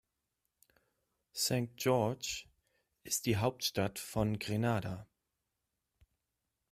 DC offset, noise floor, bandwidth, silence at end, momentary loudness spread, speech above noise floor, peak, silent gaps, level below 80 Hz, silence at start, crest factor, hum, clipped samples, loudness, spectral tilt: under 0.1%; -87 dBFS; 16 kHz; 1.65 s; 10 LU; 52 dB; -18 dBFS; none; -62 dBFS; 1.35 s; 20 dB; none; under 0.1%; -35 LUFS; -4.5 dB/octave